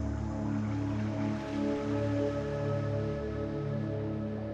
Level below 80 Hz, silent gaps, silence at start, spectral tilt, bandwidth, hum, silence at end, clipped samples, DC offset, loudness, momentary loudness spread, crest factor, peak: -46 dBFS; none; 0 s; -8.5 dB/octave; 8 kHz; none; 0 s; under 0.1%; under 0.1%; -34 LUFS; 3 LU; 12 dB; -20 dBFS